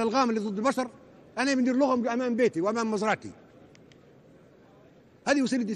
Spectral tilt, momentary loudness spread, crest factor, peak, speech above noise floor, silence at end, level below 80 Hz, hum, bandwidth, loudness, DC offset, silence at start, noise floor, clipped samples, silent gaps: -4.5 dB/octave; 9 LU; 16 dB; -12 dBFS; 30 dB; 0 s; -68 dBFS; none; 12 kHz; -27 LUFS; under 0.1%; 0 s; -56 dBFS; under 0.1%; none